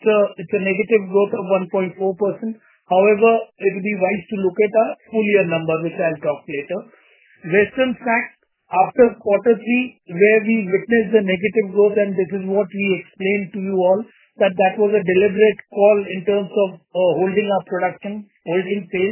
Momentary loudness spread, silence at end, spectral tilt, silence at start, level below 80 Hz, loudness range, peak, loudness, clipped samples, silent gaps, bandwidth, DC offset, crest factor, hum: 8 LU; 0 s; -10 dB/octave; 0 s; -62 dBFS; 3 LU; -2 dBFS; -18 LUFS; under 0.1%; none; 3.2 kHz; under 0.1%; 16 dB; none